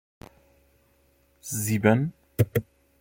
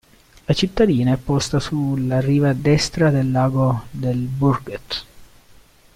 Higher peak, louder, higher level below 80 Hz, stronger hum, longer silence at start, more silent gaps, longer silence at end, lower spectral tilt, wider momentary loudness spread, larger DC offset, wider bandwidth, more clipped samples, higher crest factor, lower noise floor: about the same, -4 dBFS vs -4 dBFS; second, -26 LUFS vs -19 LUFS; second, -56 dBFS vs -42 dBFS; neither; first, 1.45 s vs 0.5 s; neither; second, 0.4 s vs 0.7 s; about the same, -6 dB/octave vs -6.5 dB/octave; about the same, 11 LU vs 9 LU; neither; first, 16.5 kHz vs 14 kHz; neither; first, 24 dB vs 16 dB; first, -64 dBFS vs -49 dBFS